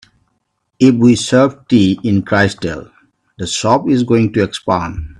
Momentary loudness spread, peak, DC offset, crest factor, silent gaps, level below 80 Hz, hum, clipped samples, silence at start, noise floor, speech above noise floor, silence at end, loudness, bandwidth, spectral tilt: 10 LU; 0 dBFS; under 0.1%; 14 dB; none; -40 dBFS; none; under 0.1%; 0.8 s; -67 dBFS; 54 dB; 0.15 s; -13 LUFS; 11 kHz; -5.5 dB/octave